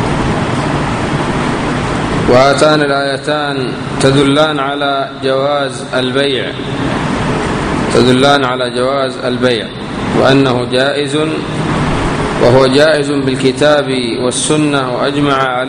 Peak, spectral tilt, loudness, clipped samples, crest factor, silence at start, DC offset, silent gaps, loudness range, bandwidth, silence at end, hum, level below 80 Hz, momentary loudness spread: 0 dBFS; -5 dB/octave; -12 LUFS; 0.2%; 12 dB; 0 s; under 0.1%; none; 2 LU; 10.5 kHz; 0 s; none; -32 dBFS; 7 LU